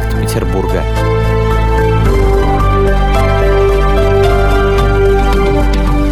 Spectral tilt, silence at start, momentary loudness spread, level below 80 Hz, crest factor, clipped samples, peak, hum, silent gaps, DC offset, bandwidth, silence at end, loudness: -7 dB/octave; 0 s; 4 LU; -14 dBFS; 10 dB; under 0.1%; 0 dBFS; none; none; under 0.1%; 13.5 kHz; 0 s; -12 LUFS